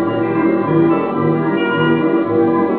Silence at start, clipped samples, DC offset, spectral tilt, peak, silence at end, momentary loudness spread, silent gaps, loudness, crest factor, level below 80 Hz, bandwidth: 0 s; under 0.1%; 0.2%; -11.5 dB/octave; -2 dBFS; 0 s; 2 LU; none; -15 LUFS; 12 dB; -60 dBFS; 4 kHz